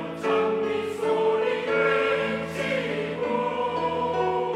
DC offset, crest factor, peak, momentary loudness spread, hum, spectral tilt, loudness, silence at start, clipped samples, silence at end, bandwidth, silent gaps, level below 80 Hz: under 0.1%; 14 dB; -10 dBFS; 5 LU; none; -5.5 dB/octave; -25 LUFS; 0 s; under 0.1%; 0 s; 12.5 kHz; none; -64 dBFS